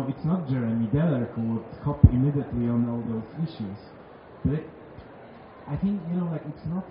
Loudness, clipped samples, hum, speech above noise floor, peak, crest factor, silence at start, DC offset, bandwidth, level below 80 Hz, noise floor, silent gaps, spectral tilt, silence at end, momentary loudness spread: -27 LUFS; under 0.1%; none; 20 dB; 0 dBFS; 26 dB; 0 s; under 0.1%; 5.2 kHz; -38 dBFS; -46 dBFS; none; -10 dB/octave; 0 s; 24 LU